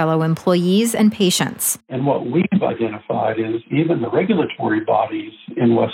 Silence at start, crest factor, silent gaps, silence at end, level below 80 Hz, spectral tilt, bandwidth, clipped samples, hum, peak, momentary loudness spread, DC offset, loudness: 0 s; 14 dB; none; 0 s; -62 dBFS; -5 dB/octave; 17 kHz; under 0.1%; none; -4 dBFS; 6 LU; under 0.1%; -18 LUFS